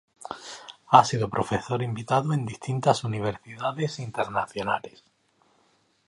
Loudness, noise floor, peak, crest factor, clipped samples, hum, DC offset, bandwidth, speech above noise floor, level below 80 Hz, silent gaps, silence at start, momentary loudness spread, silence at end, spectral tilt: -26 LUFS; -66 dBFS; -2 dBFS; 26 dB; under 0.1%; none; under 0.1%; 11.5 kHz; 41 dB; -58 dBFS; none; 0.2 s; 19 LU; 1.2 s; -5.5 dB/octave